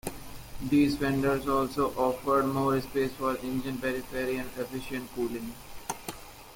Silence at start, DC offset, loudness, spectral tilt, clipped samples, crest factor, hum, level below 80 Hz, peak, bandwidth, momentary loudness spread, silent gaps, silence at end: 0.05 s; under 0.1%; -30 LUFS; -5.5 dB/octave; under 0.1%; 16 dB; none; -50 dBFS; -14 dBFS; 17 kHz; 14 LU; none; 0 s